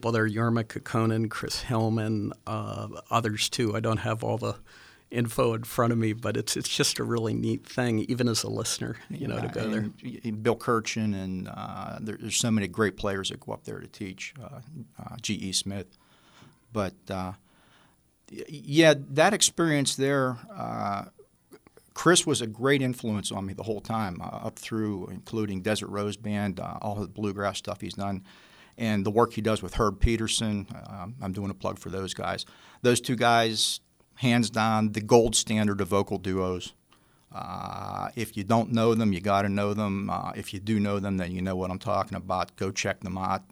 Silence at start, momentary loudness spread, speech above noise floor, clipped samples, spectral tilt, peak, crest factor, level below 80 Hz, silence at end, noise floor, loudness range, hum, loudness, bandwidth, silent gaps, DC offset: 0 s; 14 LU; 35 dB; under 0.1%; -4.5 dB/octave; -4 dBFS; 24 dB; -48 dBFS; 0.1 s; -63 dBFS; 7 LU; none; -28 LUFS; over 20 kHz; none; under 0.1%